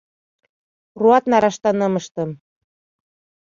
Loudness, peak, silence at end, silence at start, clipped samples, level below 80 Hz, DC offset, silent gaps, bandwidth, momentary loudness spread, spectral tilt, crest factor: -18 LUFS; -2 dBFS; 1.1 s; 0.95 s; under 0.1%; -64 dBFS; under 0.1%; 2.11-2.15 s; 7.4 kHz; 13 LU; -6 dB/octave; 18 dB